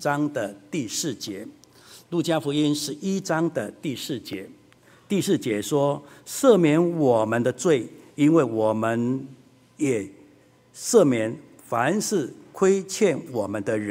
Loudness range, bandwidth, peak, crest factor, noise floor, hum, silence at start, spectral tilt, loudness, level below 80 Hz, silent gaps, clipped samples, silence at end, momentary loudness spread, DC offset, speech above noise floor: 6 LU; 16 kHz; -4 dBFS; 20 dB; -55 dBFS; none; 0 s; -5 dB/octave; -24 LUFS; -68 dBFS; none; under 0.1%; 0 s; 14 LU; under 0.1%; 32 dB